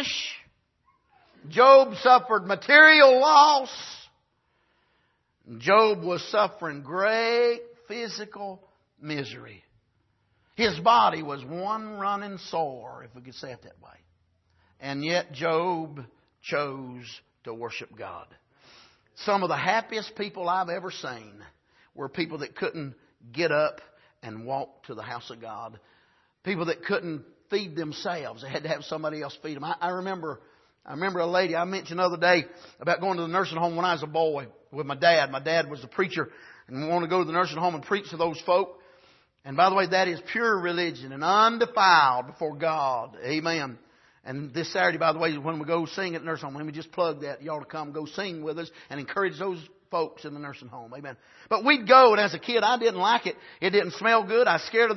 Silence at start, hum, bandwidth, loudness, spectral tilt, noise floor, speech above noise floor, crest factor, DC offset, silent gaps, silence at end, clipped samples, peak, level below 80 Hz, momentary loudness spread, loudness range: 0 s; none; 6.2 kHz; -24 LUFS; -4.5 dB/octave; -71 dBFS; 46 dB; 24 dB; under 0.1%; none; 0 s; under 0.1%; -2 dBFS; -72 dBFS; 21 LU; 14 LU